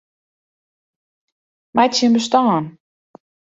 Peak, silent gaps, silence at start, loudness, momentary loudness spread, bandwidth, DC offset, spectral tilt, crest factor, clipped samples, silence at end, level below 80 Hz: -2 dBFS; none; 1.75 s; -16 LUFS; 8 LU; 7.8 kHz; under 0.1%; -4.5 dB/octave; 18 dB; under 0.1%; 0.7 s; -66 dBFS